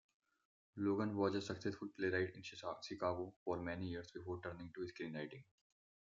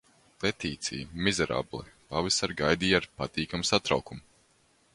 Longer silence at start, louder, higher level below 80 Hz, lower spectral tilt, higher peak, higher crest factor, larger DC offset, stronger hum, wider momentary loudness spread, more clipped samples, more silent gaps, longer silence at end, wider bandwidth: first, 0.75 s vs 0.4 s; second, -44 LUFS vs -29 LUFS; second, -76 dBFS vs -52 dBFS; first, -6 dB/octave vs -3.5 dB/octave; second, -24 dBFS vs -6 dBFS; about the same, 20 dB vs 24 dB; neither; neither; about the same, 10 LU vs 9 LU; neither; first, 3.36-3.46 s vs none; about the same, 0.7 s vs 0.75 s; second, 7.6 kHz vs 11.5 kHz